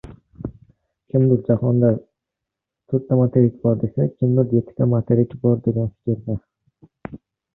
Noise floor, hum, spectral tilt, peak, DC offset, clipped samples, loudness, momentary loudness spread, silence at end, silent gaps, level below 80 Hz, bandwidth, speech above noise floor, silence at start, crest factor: -84 dBFS; none; -14 dB/octave; -2 dBFS; under 0.1%; under 0.1%; -20 LUFS; 18 LU; 0.4 s; none; -50 dBFS; 2.4 kHz; 66 dB; 0.05 s; 18 dB